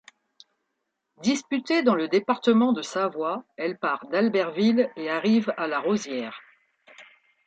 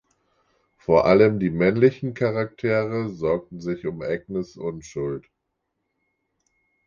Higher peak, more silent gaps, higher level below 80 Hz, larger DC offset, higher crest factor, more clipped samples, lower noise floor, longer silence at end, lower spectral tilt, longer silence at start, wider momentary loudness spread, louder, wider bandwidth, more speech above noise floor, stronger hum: second, -8 dBFS vs -4 dBFS; neither; second, -76 dBFS vs -52 dBFS; neither; about the same, 18 dB vs 20 dB; neither; about the same, -80 dBFS vs -78 dBFS; second, 0.45 s vs 1.65 s; second, -5 dB/octave vs -8 dB/octave; first, 1.2 s vs 0.9 s; second, 9 LU vs 14 LU; about the same, -25 LUFS vs -23 LUFS; first, 8.8 kHz vs 7.2 kHz; about the same, 55 dB vs 56 dB; neither